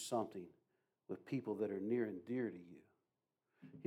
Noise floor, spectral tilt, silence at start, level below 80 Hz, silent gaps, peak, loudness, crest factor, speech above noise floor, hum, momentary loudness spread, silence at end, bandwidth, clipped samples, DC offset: -90 dBFS; -6 dB/octave; 0 s; under -90 dBFS; none; -26 dBFS; -43 LUFS; 18 dB; 47 dB; none; 19 LU; 0 s; 16 kHz; under 0.1%; under 0.1%